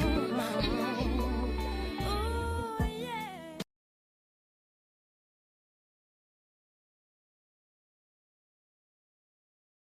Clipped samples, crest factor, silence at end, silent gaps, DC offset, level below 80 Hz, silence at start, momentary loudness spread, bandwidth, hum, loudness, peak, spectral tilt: under 0.1%; 20 dB; 6.2 s; none; under 0.1%; -42 dBFS; 0 s; 11 LU; 15.5 kHz; none; -34 LUFS; -16 dBFS; -6 dB/octave